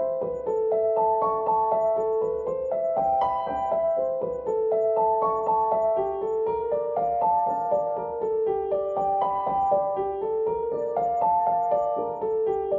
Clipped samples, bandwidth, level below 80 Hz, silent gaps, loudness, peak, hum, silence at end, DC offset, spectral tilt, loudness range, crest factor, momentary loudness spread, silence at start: under 0.1%; 7.2 kHz; -58 dBFS; none; -25 LUFS; -12 dBFS; none; 0 s; under 0.1%; -8.5 dB/octave; 1 LU; 14 dB; 5 LU; 0 s